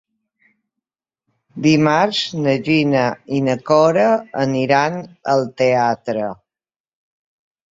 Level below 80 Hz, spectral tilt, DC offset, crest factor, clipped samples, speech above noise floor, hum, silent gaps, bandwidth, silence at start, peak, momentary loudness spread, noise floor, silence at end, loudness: -60 dBFS; -6 dB/octave; under 0.1%; 16 dB; under 0.1%; over 74 dB; none; none; 7.8 kHz; 1.55 s; -2 dBFS; 8 LU; under -90 dBFS; 1.4 s; -17 LUFS